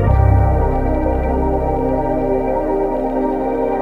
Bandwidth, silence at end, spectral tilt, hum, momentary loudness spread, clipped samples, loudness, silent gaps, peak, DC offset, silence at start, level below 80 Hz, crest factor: 4.1 kHz; 0 s; -10.5 dB/octave; none; 5 LU; under 0.1%; -17 LUFS; none; -2 dBFS; under 0.1%; 0 s; -20 dBFS; 14 dB